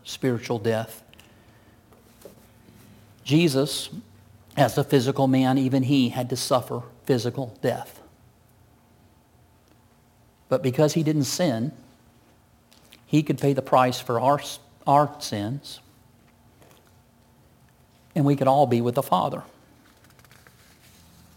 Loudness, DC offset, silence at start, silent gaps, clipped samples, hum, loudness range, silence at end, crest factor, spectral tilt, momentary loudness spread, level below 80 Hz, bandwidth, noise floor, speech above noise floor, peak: -24 LUFS; under 0.1%; 0.05 s; none; under 0.1%; none; 9 LU; 1.9 s; 20 dB; -6 dB/octave; 14 LU; -64 dBFS; 17 kHz; -58 dBFS; 35 dB; -6 dBFS